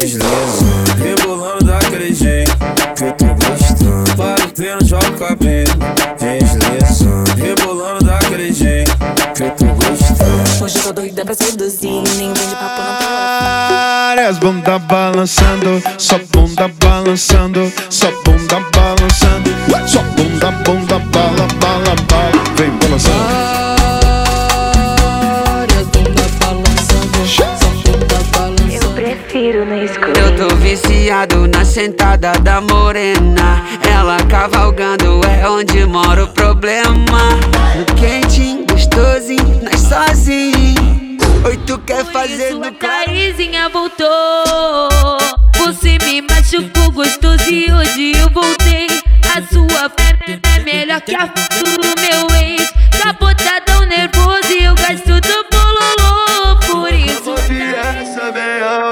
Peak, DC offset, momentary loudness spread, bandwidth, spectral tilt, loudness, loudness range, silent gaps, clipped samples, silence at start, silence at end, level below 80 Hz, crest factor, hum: 0 dBFS; under 0.1%; 5 LU; 18 kHz; -4.5 dB/octave; -12 LUFS; 2 LU; none; under 0.1%; 0 s; 0 s; -14 dBFS; 10 dB; none